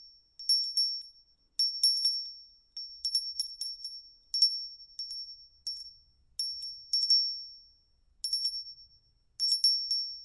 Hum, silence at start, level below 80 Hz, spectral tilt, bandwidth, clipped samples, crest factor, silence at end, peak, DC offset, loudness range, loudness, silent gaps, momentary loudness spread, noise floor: none; 0 s; -70 dBFS; 4 dB/octave; 11.5 kHz; under 0.1%; 20 dB; 0 s; -14 dBFS; under 0.1%; 4 LU; -29 LUFS; none; 18 LU; -66 dBFS